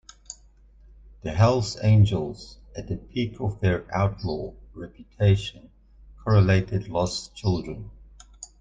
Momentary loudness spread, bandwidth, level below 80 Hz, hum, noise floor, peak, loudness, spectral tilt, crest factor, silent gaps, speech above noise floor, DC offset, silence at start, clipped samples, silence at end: 23 LU; 7.8 kHz; -44 dBFS; none; -53 dBFS; -6 dBFS; -24 LUFS; -6.5 dB/octave; 18 dB; none; 30 dB; under 0.1%; 0.3 s; under 0.1%; 0.15 s